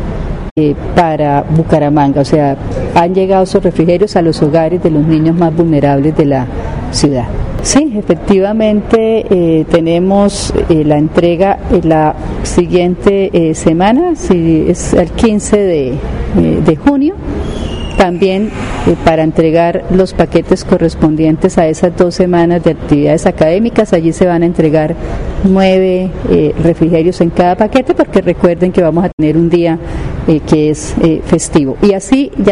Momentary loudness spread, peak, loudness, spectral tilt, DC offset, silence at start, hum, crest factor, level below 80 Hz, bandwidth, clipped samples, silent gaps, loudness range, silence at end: 5 LU; 0 dBFS; -10 LUFS; -6.5 dB/octave; under 0.1%; 0 s; none; 10 dB; -26 dBFS; 11 kHz; 0.1%; 0.51-0.56 s, 29.13-29.18 s; 2 LU; 0 s